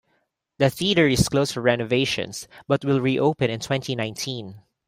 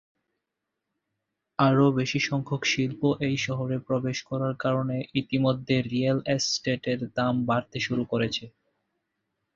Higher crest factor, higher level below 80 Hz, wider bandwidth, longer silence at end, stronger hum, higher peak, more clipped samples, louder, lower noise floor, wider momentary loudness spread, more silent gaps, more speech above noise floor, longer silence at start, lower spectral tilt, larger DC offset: about the same, 18 dB vs 20 dB; first, -48 dBFS vs -60 dBFS; first, 16 kHz vs 7.6 kHz; second, 0.3 s vs 1.05 s; neither; about the same, -4 dBFS vs -6 dBFS; neither; first, -22 LUFS vs -26 LUFS; second, -71 dBFS vs -84 dBFS; first, 11 LU vs 6 LU; neither; second, 48 dB vs 58 dB; second, 0.6 s vs 1.6 s; about the same, -5 dB/octave vs -5.5 dB/octave; neither